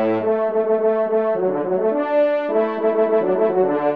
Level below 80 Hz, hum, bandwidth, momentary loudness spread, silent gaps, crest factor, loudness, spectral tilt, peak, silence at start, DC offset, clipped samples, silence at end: -70 dBFS; none; 4.7 kHz; 2 LU; none; 12 dB; -19 LUFS; -9.5 dB/octave; -6 dBFS; 0 s; 0.2%; under 0.1%; 0 s